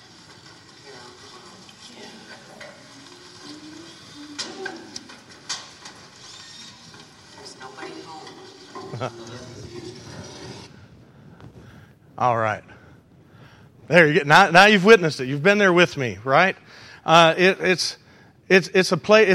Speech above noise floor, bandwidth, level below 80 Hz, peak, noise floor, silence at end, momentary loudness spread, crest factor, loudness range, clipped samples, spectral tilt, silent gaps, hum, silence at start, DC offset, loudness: 33 dB; 15 kHz; -62 dBFS; 0 dBFS; -50 dBFS; 0 s; 27 LU; 22 dB; 23 LU; under 0.1%; -4.5 dB/octave; none; none; 2 s; under 0.1%; -17 LUFS